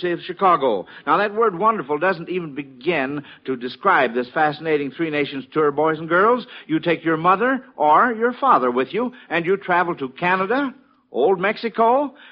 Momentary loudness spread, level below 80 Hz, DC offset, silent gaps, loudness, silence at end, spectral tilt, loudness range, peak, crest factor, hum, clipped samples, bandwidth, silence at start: 9 LU; -66 dBFS; under 0.1%; none; -20 LUFS; 0.2 s; -3.5 dB/octave; 3 LU; -4 dBFS; 16 dB; none; under 0.1%; 5.6 kHz; 0 s